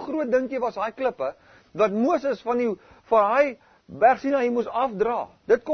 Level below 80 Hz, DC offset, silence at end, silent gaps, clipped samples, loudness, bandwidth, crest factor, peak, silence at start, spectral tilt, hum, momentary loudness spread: -62 dBFS; under 0.1%; 0 s; none; under 0.1%; -24 LUFS; 6.6 kHz; 18 dB; -6 dBFS; 0 s; -6.5 dB/octave; none; 8 LU